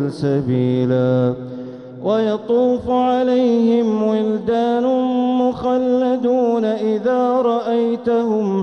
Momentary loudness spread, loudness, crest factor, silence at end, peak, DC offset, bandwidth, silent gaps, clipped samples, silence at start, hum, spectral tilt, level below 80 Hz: 4 LU; -17 LUFS; 10 dB; 0 s; -6 dBFS; under 0.1%; 6.6 kHz; none; under 0.1%; 0 s; none; -8.5 dB/octave; -52 dBFS